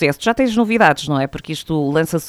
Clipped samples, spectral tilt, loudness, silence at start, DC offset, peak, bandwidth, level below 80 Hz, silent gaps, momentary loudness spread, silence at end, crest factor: under 0.1%; -5.5 dB/octave; -17 LUFS; 0 s; under 0.1%; 0 dBFS; 19.5 kHz; -46 dBFS; none; 9 LU; 0 s; 16 dB